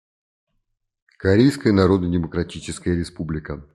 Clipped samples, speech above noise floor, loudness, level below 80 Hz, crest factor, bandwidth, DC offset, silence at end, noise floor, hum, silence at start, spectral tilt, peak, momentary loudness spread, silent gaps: under 0.1%; 53 dB; -21 LUFS; -46 dBFS; 18 dB; 12.5 kHz; under 0.1%; 0.1 s; -73 dBFS; none; 1.2 s; -7 dB/octave; -2 dBFS; 12 LU; none